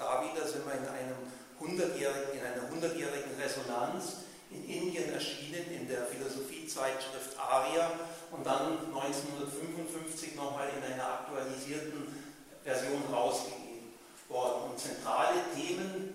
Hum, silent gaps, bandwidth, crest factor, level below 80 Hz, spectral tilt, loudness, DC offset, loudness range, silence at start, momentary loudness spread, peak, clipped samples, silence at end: none; none; 16 kHz; 22 dB; -76 dBFS; -3.5 dB/octave; -36 LUFS; under 0.1%; 3 LU; 0 s; 11 LU; -16 dBFS; under 0.1%; 0 s